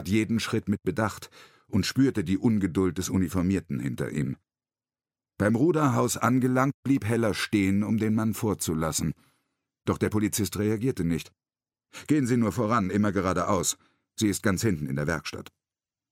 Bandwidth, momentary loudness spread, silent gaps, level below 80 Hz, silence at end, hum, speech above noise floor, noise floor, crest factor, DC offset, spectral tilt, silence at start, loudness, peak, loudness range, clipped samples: 16.5 kHz; 9 LU; 6.74-6.83 s; -54 dBFS; 0.7 s; none; over 64 dB; under -90 dBFS; 18 dB; under 0.1%; -5.5 dB/octave; 0 s; -26 LUFS; -8 dBFS; 4 LU; under 0.1%